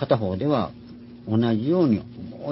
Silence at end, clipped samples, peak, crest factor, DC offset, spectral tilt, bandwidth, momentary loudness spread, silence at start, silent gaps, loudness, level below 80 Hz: 0 s; under 0.1%; -6 dBFS; 18 dB; under 0.1%; -12 dB/octave; 5.8 kHz; 19 LU; 0 s; none; -23 LUFS; -50 dBFS